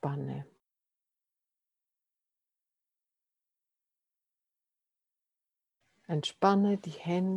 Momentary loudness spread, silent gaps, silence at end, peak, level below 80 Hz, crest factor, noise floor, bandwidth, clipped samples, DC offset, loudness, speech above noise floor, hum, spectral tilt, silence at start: 13 LU; none; 0 s; -10 dBFS; -80 dBFS; 26 dB; -89 dBFS; 10 kHz; under 0.1%; under 0.1%; -31 LUFS; 59 dB; none; -7 dB/octave; 0.05 s